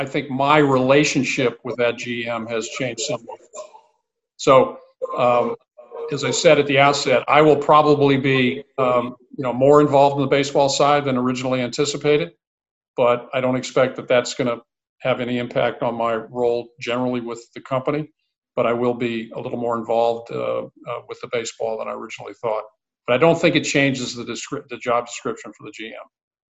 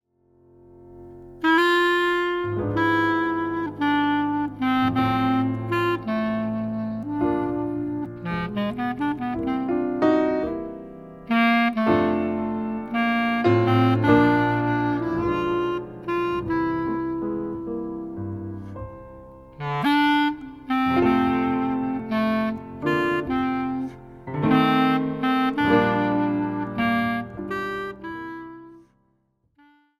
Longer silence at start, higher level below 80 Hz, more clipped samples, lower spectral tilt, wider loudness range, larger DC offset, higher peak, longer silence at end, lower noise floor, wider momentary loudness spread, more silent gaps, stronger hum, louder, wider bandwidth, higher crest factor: second, 0 s vs 0.8 s; second, -58 dBFS vs -50 dBFS; neither; second, -5 dB/octave vs -7.5 dB/octave; about the same, 8 LU vs 6 LU; neither; first, 0 dBFS vs -4 dBFS; second, 0.45 s vs 1.2 s; about the same, -71 dBFS vs -68 dBFS; first, 16 LU vs 13 LU; first, 12.47-12.58 s, 12.71-12.81 s, 12.88-12.94 s, 14.89-14.96 s, 18.38-18.42 s vs none; neither; first, -19 LUFS vs -23 LUFS; second, 8.4 kHz vs 13.5 kHz; about the same, 20 dB vs 20 dB